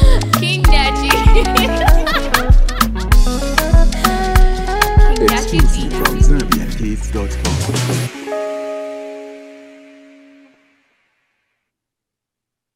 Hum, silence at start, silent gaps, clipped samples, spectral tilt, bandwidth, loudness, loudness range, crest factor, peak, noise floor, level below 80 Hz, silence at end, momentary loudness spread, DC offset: none; 0 s; none; under 0.1%; -4.5 dB/octave; 16.5 kHz; -15 LUFS; 14 LU; 14 dB; 0 dBFS; -83 dBFS; -16 dBFS; 3.25 s; 10 LU; under 0.1%